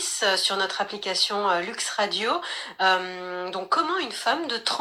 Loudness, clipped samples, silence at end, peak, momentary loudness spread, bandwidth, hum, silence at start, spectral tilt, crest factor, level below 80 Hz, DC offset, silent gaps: -25 LUFS; under 0.1%; 0 s; -8 dBFS; 8 LU; 17.5 kHz; none; 0 s; -1 dB/octave; 18 dB; -74 dBFS; under 0.1%; none